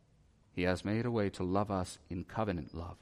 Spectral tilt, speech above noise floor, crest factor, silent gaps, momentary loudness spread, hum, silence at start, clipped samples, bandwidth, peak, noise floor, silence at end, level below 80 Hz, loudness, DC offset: -6.5 dB/octave; 31 dB; 18 dB; none; 10 LU; none; 0.55 s; under 0.1%; 14 kHz; -18 dBFS; -66 dBFS; 0.05 s; -58 dBFS; -36 LUFS; under 0.1%